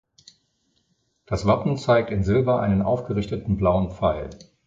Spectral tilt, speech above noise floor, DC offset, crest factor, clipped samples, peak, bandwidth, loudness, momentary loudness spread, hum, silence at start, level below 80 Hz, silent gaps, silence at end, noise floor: -8 dB/octave; 47 dB; under 0.1%; 18 dB; under 0.1%; -6 dBFS; 7.8 kHz; -23 LUFS; 7 LU; none; 1.3 s; -40 dBFS; none; 0.25 s; -69 dBFS